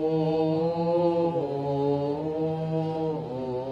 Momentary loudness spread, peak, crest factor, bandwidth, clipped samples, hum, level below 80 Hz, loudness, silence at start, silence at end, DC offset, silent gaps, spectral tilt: 6 LU; -12 dBFS; 14 dB; 6.8 kHz; under 0.1%; none; -58 dBFS; -27 LUFS; 0 s; 0 s; under 0.1%; none; -9.5 dB/octave